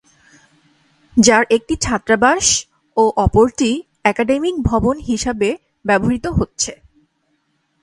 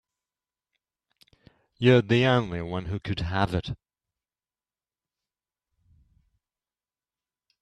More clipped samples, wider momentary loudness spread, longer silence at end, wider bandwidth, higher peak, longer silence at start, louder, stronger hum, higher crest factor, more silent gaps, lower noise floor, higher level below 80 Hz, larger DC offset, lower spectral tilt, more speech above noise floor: neither; second, 8 LU vs 12 LU; second, 1.1 s vs 3.85 s; first, 11.5 kHz vs 9.6 kHz; first, 0 dBFS vs -6 dBFS; second, 1.15 s vs 1.8 s; first, -16 LUFS vs -25 LUFS; neither; second, 18 dB vs 24 dB; neither; second, -65 dBFS vs under -90 dBFS; first, -34 dBFS vs -52 dBFS; neither; second, -4 dB/octave vs -7.5 dB/octave; second, 50 dB vs over 66 dB